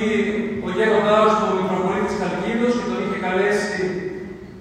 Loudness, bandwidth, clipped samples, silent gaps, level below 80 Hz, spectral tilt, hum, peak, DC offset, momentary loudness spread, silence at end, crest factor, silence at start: -20 LUFS; 10.5 kHz; under 0.1%; none; -50 dBFS; -5.5 dB/octave; none; -4 dBFS; under 0.1%; 9 LU; 0 s; 16 dB; 0 s